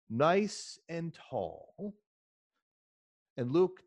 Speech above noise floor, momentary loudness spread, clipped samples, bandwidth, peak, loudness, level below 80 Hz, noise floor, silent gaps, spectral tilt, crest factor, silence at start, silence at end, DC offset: over 57 dB; 17 LU; under 0.1%; 10.5 kHz; -14 dBFS; -34 LUFS; -76 dBFS; under -90 dBFS; 2.06-2.50 s, 2.62-3.36 s; -6 dB/octave; 20 dB; 0.1 s; 0.1 s; under 0.1%